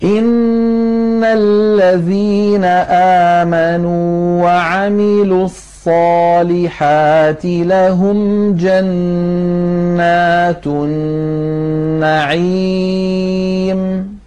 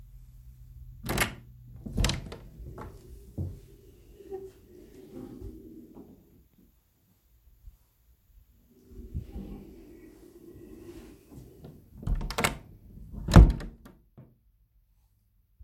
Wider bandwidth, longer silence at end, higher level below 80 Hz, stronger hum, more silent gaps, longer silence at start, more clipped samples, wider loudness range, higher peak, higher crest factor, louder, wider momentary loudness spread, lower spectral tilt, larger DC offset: second, 10.5 kHz vs 16.5 kHz; second, 0.1 s vs 1.95 s; second, -42 dBFS vs -34 dBFS; neither; neither; second, 0 s vs 0.15 s; neither; second, 3 LU vs 22 LU; about the same, -4 dBFS vs -2 dBFS; second, 8 dB vs 30 dB; first, -12 LUFS vs -28 LUFS; second, 6 LU vs 23 LU; first, -7.5 dB/octave vs -5.5 dB/octave; first, 0.8% vs under 0.1%